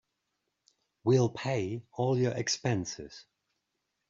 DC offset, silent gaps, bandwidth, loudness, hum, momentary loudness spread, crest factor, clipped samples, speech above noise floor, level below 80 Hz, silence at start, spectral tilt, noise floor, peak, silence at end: under 0.1%; none; 7.6 kHz; -31 LUFS; none; 15 LU; 20 dB; under 0.1%; 53 dB; -68 dBFS; 1.05 s; -5.5 dB/octave; -83 dBFS; -14 dBFS; 0.9 s